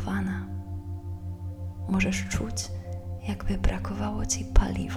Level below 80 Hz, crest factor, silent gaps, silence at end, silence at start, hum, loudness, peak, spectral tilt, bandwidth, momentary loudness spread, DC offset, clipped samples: -32 dBFS; 24 dB; none; 0 s; 0 s; none; -31 LUFS; -4 dBFS; -5 dB/octave; 13.5 kHz; 11 LU; under 0.1%; under 0.1%